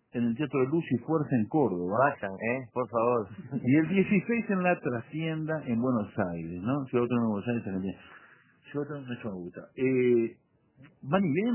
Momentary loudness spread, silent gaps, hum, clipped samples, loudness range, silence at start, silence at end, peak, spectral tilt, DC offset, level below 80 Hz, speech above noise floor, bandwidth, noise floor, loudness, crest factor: 11 LU; none; none; under 0.1%; 5 LU; 0.15 s; 0 s; -10 dBFS; -7 dB/octave; under 0.1%; -64 dBFS; 26 dB; 3.2 kHz; -55 dBFS; -29 LUFS; 20 dB